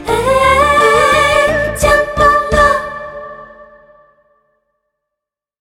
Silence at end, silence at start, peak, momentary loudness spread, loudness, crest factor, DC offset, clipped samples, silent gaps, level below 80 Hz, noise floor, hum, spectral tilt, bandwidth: 2 s; 0 s; 0 dBFS; 17 LU; -10 LUFS; 14 dB; under 0.1%; under 0.1%; none; -30 dBFS; -82 dBFS; none; -3.5 dB/octave; 17 kHz